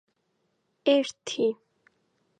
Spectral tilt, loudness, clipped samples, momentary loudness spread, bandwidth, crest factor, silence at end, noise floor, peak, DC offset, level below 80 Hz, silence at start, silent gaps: -3.5 dB/octave; -27 LUFS; under 0.1%; 9 LU; 9.4 kHz; 20 dB; 0.85 s; -75 dBFS; -10 dBFS; under 0.1%; -82 dBFS; 0.85 s; none